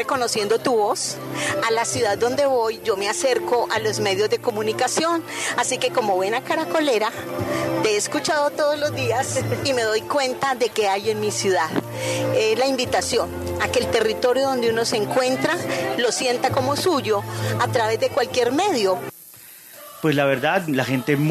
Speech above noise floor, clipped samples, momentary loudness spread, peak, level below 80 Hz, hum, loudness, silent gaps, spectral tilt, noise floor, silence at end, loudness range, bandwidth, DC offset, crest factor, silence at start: 22 dB; under 0.1%; 5 LU; -4 dBFS; -60 dBFS; none; -21 LUFS; none; -3.5 dB/octave; -43 dBFS; 0 s; 1 LU; 14 kHz; under 0.1%; 16 dB; 0 s